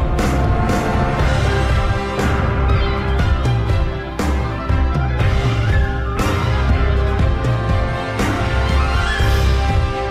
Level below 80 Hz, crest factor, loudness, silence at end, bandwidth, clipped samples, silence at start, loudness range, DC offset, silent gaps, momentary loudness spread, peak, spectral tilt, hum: -20 dBFS; 10 dB; -18 LUFS; 0 s; 13.5 kHz; under 0.1%; 0 s; 1 LU; under 0.1%; none; 3 LU; -6 dBFS; -6.5 dB/octave; none